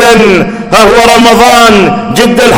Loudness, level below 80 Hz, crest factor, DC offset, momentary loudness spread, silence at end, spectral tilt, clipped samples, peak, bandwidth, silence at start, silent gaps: -4 LUFS; -28 dBFS; 4 dB; under 0.1%; 6 LU; 0 s; -4 dB/octave; 20%; 0 dBFS; over 20 kHz; 0 s; none